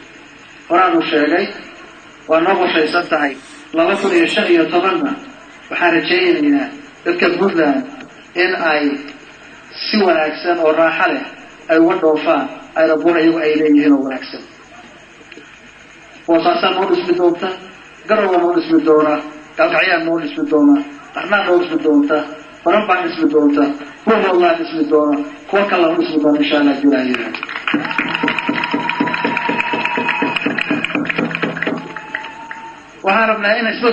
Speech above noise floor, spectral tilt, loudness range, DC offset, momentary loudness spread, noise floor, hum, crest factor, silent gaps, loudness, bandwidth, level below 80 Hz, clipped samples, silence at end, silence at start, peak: 26 dB; -5.5 dB/octave; 4 LU; under 0.1%; 13 LU; -40 dBFS; none; 16 dB; none; -15 LUFS; 9 kHz; -60 dBFS; under 0.1%; 0 s; 0 s; 0 dBFS